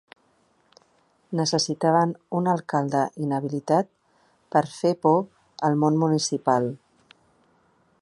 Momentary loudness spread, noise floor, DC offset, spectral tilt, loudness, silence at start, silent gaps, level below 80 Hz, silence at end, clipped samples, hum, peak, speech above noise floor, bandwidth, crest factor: 7 LU; -65 dBFS; under 0.1%; -5.5 dB/octave; -24 LUFS; 1.3 s; none; -70 dBFS; 1.25 s; under 0.1%; none; -6 dBFS; 42 dB; 11.5 kHz; 20 dB